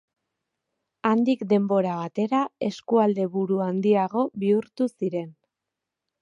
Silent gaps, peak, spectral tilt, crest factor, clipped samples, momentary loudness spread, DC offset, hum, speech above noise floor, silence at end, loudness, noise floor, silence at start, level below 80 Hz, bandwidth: none; -6 dBFS; -8 dB/octave; 18 dB; under 0.1%; 7 LU; under 0.1%; none; 62 dB; 0.9 s; -24 LUFS; -86 dBFS; 1.05 s; -76 dBFS; 7.6 kHz